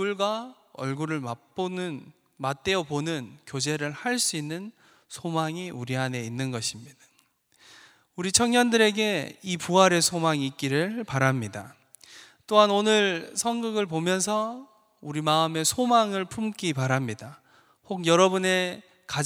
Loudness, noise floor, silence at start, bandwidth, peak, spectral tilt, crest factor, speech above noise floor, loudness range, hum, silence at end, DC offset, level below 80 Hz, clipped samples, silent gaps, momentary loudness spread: -25 LUFS; -66 dBFS; 0 s; over 20 kHz; -4 dBFS; -4 dB/octave; 24 dB; 40 dB; 7 LU; none; 0 s; under 0.1%; -66 dBFS; under 0.1%; none; 16 LU